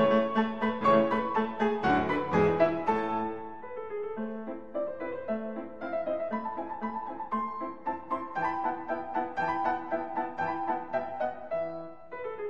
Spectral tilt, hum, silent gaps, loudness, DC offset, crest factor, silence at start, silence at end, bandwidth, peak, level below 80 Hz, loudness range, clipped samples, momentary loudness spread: -7.5 dB/octave; none; none; -31 LUFS; 0.4%; 18 dB; 0 s; 0 s; 7.6 kHz; -12 dBFS; -60 dBFS; 8 LU; under 0.1%; 12 LU